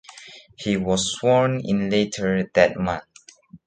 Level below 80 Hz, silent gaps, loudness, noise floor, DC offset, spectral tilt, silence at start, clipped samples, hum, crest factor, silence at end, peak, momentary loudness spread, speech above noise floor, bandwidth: -50 dBFS; none; -22 LUFS; -48 dBFS; under 0.1%; -5 dB/octave; 0.1 s; under 0.1%; none; 20 dB; 0.1 s; -2 dBFS; 13 LU; 27 dB; 9.4 kHz